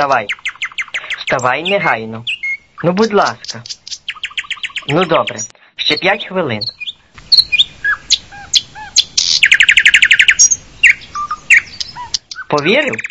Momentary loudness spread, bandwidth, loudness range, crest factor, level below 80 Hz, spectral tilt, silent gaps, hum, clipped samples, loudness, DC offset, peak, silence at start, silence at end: 16 LU; 11 kHz; 8 LU; 14 dB; -48 dBFS; -1 dB/octave; none; none; 0.4%; -12 LUFS; 0.1%; 0 dBFS; 0 s; 0.05 s